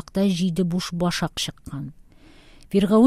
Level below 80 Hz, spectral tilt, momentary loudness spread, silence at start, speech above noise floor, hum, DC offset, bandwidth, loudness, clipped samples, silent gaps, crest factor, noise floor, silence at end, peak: -48 dBFS; -6 dB/octave; 13 LU; 0.15 s; 28 dB; none; under 0.1%; 15.5 kHz; -24 LUFS; under 0.1%; none; 18 dB; -49 dBFS; 0 s; -4 dBFS